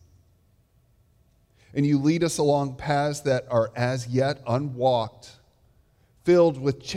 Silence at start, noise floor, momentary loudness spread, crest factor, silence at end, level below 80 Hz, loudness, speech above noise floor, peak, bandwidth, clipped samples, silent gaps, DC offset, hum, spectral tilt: 1.75 s; -62 dBFS; 8 LU; 16 dB; 0 s; -58 dBFS; -24 LUFS; 39 dB; -8 dBFS; 15 kHz; under 0.1%; none; under 0.1%; none; -6 dB/octave